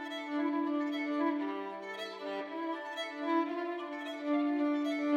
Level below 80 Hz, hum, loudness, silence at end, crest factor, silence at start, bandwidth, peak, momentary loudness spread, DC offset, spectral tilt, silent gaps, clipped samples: under -90 dBFS; none; -35 LUFS; 0 s; 14 dB; 0 s; 8.8 kHz; -20 dBFS; 8 LU; under 0.1%; -4 dB/octave; none; under 0.1%